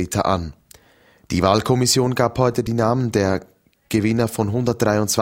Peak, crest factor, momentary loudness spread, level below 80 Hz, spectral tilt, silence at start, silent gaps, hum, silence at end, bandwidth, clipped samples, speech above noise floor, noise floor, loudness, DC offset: 0 dBFS; 20 dB; 7 LU; -44 dBFS; -5 dB/octave; 0 s; none; none; 0 s; 16.5 kHz; under 0.1%; 35 dB; -54 dBFS; -19 LUFS; under 0.1%